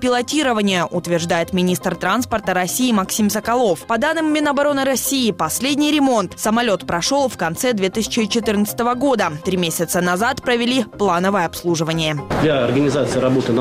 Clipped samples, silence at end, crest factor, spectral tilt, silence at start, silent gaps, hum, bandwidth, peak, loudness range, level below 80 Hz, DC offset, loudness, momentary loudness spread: under 0.1%; 0 s; 12 dB; -4 dB/octave; 0 s; none; none; 16 kHz; -6 dBFS; 1 LU; -46 dBFS; under 0.1%; -18 LUFS; 3 LU